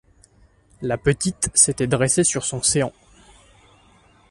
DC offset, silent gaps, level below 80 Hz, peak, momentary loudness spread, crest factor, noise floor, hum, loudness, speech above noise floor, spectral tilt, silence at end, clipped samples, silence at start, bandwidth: under 0.1%; none; -46 dBFS; 0 dBFS; 10 LU; 24 dB; -55 dBFS; none; -19 LUFS; 35 dB; -3.5 dB/octave; 1.4 s; under 0.1%; 0.8 s; 11.5 kHz